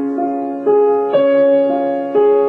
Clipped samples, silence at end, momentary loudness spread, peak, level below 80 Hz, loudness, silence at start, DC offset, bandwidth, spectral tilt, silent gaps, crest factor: under 0.1%; 0 s; 7 LU; -4 dBFS; -66 dBFS; -14 LUFS; 0 s; under 0.1%; 4.2 kHz; -8 dB/octave; none; 10 dB